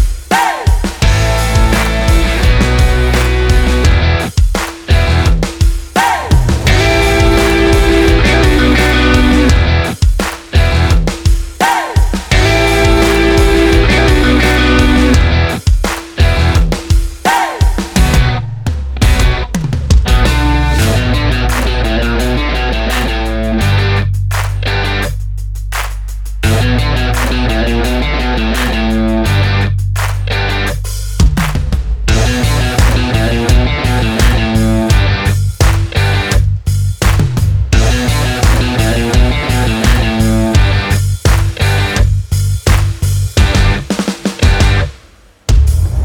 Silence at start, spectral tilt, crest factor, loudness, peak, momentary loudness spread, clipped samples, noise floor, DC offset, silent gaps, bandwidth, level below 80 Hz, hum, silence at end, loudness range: 0 s; -5.5 dB/octave; 10 dB; -12 LUFS; 0 dBFS; 6 LU; under 0.1%; -42 dBFS; under 0.1%; none; 18.5 kHz; -14 dBFS; none; 0 s; 4 LU